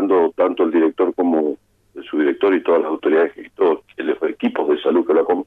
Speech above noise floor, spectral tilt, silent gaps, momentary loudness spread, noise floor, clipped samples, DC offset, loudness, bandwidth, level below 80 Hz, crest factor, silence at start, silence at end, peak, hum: 22 dB; -7.5 dB/octave; none; 7 LU; -38 dBFS; under 0.1%; under 0.1%; -18 LUFS; 4 kHz; -66 dBFS; 12 dB; 0 s; 0.05 s; -6 dBFS; none